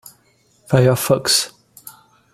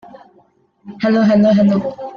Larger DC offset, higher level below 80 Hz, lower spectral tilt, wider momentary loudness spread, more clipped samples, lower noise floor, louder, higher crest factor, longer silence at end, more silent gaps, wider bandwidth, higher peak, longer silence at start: neither; about the same, -54 dBFS vs -56 dBFS; second, -4 dB/octave vs -8.5 dB/octave; second, 5 LU vs 8 LU; neither; first, -58 dBFS vs -54 dBFS; about the same, -16 LUFS vs -14 LUFS; first, 20 dB vs 12 dB; first, 0.45 s vs 0 s; neither; first, 16 kHz vs 6.6 kHz; first, 0 dBFS vs -4 dBFS; second, 0.7 s vs 0.85 s